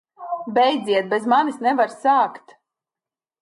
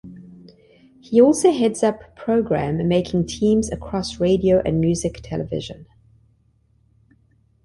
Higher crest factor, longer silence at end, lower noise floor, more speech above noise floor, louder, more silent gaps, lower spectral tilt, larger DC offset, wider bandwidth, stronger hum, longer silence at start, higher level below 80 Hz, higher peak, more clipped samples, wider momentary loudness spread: about the same, 16 dB vs 18 dB; second, 1.05 s vs 1.8 s; first, under -90 dBFS vs -60 dBFS; first, over 71 dB vs 41 dB; about the same, -20 LUFS vs -20 LUFS; neither; second, -4.5 dB/octave vs -6 dB/octave; neither; about the same, 11.5 kHz vs 11.5 kHz; neither; first, 0.2 s vs 0.05 s; second, -76 dBFS vs -44 dBFS; about the same, -6 dBFS vs -4 dBFS; neither; second, 6 LU vs 13 LU